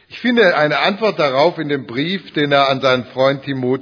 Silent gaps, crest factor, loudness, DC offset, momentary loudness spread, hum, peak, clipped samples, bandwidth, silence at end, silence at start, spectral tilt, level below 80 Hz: none; 16 dB; -16 LUFS; under 0.1%; 8 LU; none; 0 dBFS; under 0.1%; 5.4 kHz; 0 s; 0.1 s; -6 dB/octave; -62 dBFS